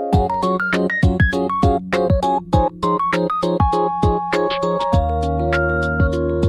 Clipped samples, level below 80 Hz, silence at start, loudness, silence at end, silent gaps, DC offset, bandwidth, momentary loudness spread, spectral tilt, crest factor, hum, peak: under 0.1%; -28 dBFS; 0 s; -18 LUFS; 0 s; none; under 0.1%; 11.5 kHz; 2 LU; -7.5 dB/octave; 14 dB; none; -4 dBFS